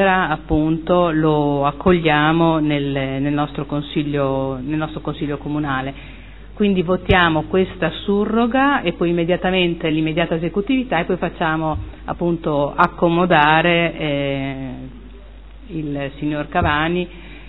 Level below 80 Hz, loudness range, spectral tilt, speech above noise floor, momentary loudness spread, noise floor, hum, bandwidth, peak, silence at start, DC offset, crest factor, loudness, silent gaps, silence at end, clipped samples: -36 dBFS; 5 LU; -10 dB/octave; 20 dB; 11 LU; -38 dBFS; none; 4.5 kHz; 0 dBFS; 0 s; 0.5%; 18 dB; -18 LUFS; none; 0 s; under 0.1%